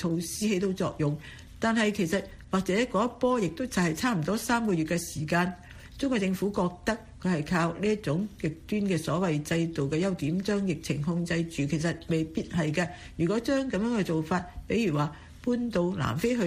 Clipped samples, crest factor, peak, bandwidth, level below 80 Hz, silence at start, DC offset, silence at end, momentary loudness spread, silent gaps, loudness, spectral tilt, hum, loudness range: under 0.1%; 16 dB; -12 dBFS; 15.5 kHz; -52 dBFS; 0 s; under 0.1%; 0 s; 5 LU; none; -29 LUFS; -6 dB/octave; none; 2 LU